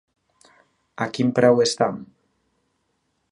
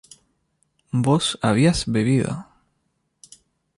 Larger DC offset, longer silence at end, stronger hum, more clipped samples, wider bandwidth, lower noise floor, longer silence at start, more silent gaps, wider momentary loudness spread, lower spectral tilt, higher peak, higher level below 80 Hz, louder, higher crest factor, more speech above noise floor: neither; about the same, 1.25 s vs 1.35 s; neither; neither; about the same, 11 kHz vs 11.5 kHz; about the same, -72 dBFS vs -71 dBFS; about the same, 1 s vs 0.95 s; neither; first, 13 LU vs 10 LU; about the same, -5 dB/octave vs -5.5 dB/octave; first, -2 dBFS vs -6 dBFS; second, -68 dBFS vs -46 dBFS; about the same, -20 LUFS vs -20 LUFS; about the same, 22 dB vs 18 dB; about the same, 52 dB vs 52 dB